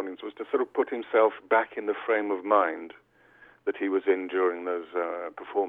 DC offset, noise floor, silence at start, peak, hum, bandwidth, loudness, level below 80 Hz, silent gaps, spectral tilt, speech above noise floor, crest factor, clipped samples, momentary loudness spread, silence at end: under 0.1%; -57 dBFS; 0 s; -8 dBFS; none; 3.9 kHz; -27 LUFS; -78 dBFS; none; -7 dB/octave; 30 dB; 20 dB; under 0.1%; 11 LU; 0 s